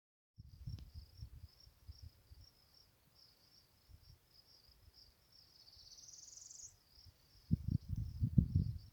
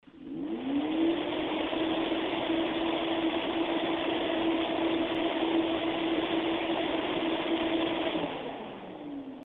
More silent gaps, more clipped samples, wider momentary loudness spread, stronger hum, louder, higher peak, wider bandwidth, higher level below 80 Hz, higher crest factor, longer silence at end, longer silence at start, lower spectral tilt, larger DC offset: neither; neither; first, 26 LU vs 9 LU; neither; second, -42 LUFS vs -30 LUFS; about the same, -16 dBFS vs -18 dBFS; first, 20 kHz vs 4.3 kHz; first, -54 dBFS vs -60 dBFS; first, 30 dB vs 14 dB; about the same, 0.05 s vs 0 s; first, 0.4 s vs 0.15 s; about the same, -6.5 dB/octave vs -7 dB/octave; neither